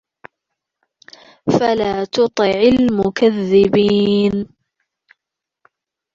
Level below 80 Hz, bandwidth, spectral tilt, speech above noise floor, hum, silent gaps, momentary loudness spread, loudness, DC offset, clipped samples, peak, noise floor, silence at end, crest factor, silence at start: -48 dBFS; 7.6 kHz; -6.5 dB/octave; 68 dB; none; none; 6 LU; -15 LUFS; under 0.1%; under 0.1%; -2 dBFS; -82 dBFS; 1.7 s; 16 dB; 1.45 s